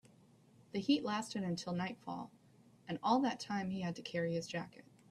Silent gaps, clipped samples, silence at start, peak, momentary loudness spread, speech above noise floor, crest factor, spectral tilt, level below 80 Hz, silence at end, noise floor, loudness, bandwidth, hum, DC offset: none; under 0.1%; 0.75 s; -20 dBFS; 12 LU; 28 dB; 20 dB; -5.5 dB/octave; -76 dBFS; 0.3 s; -65 dBFS; -39 LUFS; 12.5 kHz; none; under 0.1%